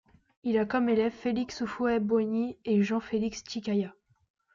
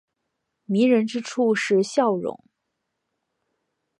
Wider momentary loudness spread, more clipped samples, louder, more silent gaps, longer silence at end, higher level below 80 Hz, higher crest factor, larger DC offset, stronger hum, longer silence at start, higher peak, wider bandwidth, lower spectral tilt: about the same, 7 LU vs 8 LU; neither; second, -29 LUFS vs -22 LUFS; neither; second, 0.65 s vs 1.65 s; first, -62 dBFS vs -76 dBFS; about the same, 16 dB vs 18 dB; neither; neither; second, 0.45 s vs 0.7 s; second, -14 dBFS vs -6 dBFS; second, 7.4 kHz vs 11 kHz; about the same, -6 dB/octave vs -5.5 dB/octave